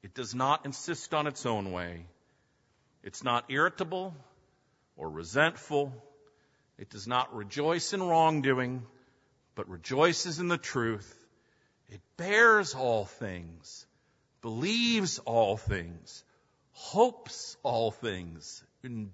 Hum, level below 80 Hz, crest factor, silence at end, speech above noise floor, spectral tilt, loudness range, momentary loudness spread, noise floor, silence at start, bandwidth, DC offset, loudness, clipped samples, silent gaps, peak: none; -58 dBFS; 22 dB; 0 s; 41 dB; -4 dB/octave; 6 LU; 19 LU; -71 dBFS; 0 s; 8 kHz; under 0.1%; -30 LUFS; under 0.1%; none; -10 dBFS